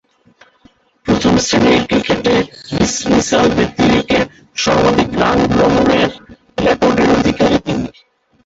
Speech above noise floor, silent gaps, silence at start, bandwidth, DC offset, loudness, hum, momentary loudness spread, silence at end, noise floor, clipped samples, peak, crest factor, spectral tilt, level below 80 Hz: 39 dB; none; 1.05 s; 8 kHz; under 0.1%; -13 LUFS; none; 7 LU; 0.55 s; -51 dBFS; under 0.1%; 0 dBFS; 14 dB; -4.5 dB/octave; -36 dBFS